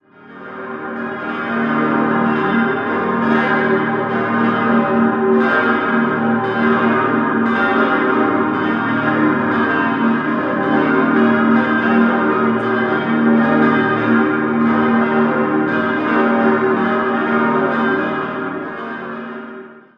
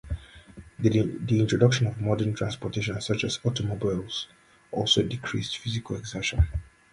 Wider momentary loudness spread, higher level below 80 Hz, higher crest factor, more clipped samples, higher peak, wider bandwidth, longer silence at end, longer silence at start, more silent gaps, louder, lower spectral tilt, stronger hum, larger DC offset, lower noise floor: about the same, 10 LU vs 12 LU; second, -56 dBFS vs -40 dBFS; second, 14 dB vs 22 dB; neither; first, -2 dBFS vs -6 dBFS; second, 5.4 kHz vs 11.5 kHz; about the same, 0.2 s vs 0.3 s; first, 0.25 s vs 0.05 s; neither; first, -16 LUFS vs -27 LUFS; first, -8.5 dB/octave vs -5.5 dB/octave; neither; neither; second, -36 dBFS vs -48 dBFS